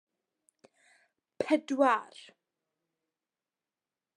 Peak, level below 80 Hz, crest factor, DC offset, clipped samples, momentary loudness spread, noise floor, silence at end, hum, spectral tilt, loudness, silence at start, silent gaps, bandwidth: -12 dBFS; -86 dBFS; 22 dB; under 0.1%; under 0.1%; 13 LU; under -90 dBFS; 2.15 s; none; -4 dB/octave; -29 LUFS; 1.4 s; none; 11.5 kHz